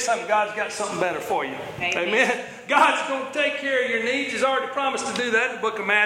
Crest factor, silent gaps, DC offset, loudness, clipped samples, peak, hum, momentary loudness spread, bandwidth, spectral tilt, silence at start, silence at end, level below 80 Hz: 18 dB; none; under 0.1%; -23 LUFS; under 0.1%; -6 dBFS; none; 7 LU; 16 kHz; -2.5 dB/octave; 0 s; 0 s; -66 dBFS